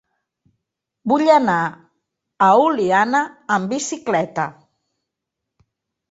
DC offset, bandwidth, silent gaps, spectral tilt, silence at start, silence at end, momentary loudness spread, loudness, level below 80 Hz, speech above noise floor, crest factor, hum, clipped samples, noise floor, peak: under 0.1%; 8 kHz; none; -4.5 dB/octave; 1.05 s; 1.6 s; 11 LU; -18 LUFS; -66 dBFS; 64 dB; 18 dB; none; under 0.1%; -81 dBFS; -2 dBFS